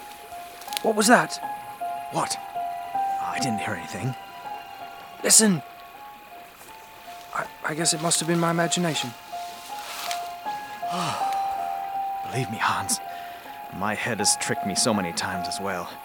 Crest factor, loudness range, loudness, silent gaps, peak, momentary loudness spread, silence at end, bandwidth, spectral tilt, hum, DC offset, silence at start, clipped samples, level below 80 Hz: 26 dB; 6 LU; -25 LUFS; none; 0 dBFS; 19 LU; 0 s; over 20 kHz; -3 dB/octave; none; under 0.1%; 0 s; under 0.1%; -66 dBFS